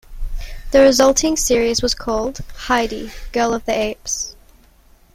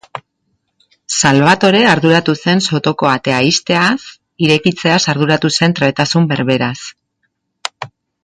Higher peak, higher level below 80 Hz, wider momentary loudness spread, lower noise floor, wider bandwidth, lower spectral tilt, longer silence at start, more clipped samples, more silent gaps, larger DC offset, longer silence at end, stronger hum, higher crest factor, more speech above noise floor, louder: about the same, 0 dBFS vs 0 dBFS; first, -32 dBFS vs -52 dBFS; about the same, 19 LU vs 17 LU; second, -50 dBFS vs -68 dBFS; first, 16 kHz vs 11 kHz; second, -2.5 dB/octave vs -4.5 dB/octave; about the same, 0.1 s vs 0.15 s; neither; neither; neither; first, 0.85 s vs 0.35 s; neither; about the same, 18 dB vs 14 dB; second, 33 dB vs 55 dB; second, -17 LUFS vs -12 LUFS